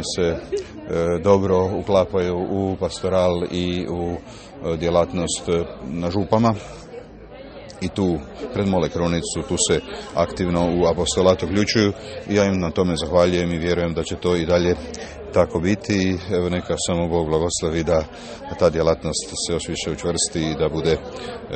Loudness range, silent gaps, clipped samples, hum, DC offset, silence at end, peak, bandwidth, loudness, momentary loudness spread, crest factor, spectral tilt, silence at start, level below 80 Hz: 4 LU; none; under 0.1%; none; under 0.1%; 0 s; 0 dBFS; 8.8 kHz; -21 LUFS; 12 LU; 20 dB; -5 dB/octave; 0 s; -40 dBFS